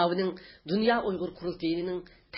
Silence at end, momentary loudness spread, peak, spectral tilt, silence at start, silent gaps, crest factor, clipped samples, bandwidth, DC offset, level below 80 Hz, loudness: 0 s; 10 LU; -10 dBFS; -10 dB/octave; 0 s; none; 20 dB; under 0.1%; 5.8 kHz; under 0.1%; -60 dBFS; -30 LUFS